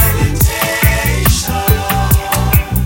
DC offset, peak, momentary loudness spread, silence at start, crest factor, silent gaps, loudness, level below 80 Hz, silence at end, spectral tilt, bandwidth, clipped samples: under 0.1%; 0 dBFS; 2 LU; 0 s; 12 dB; none; -13 LUFS; -18 dBFS; 0 s; -4.5 dB/octave; 17.5 kHz; under 0.1%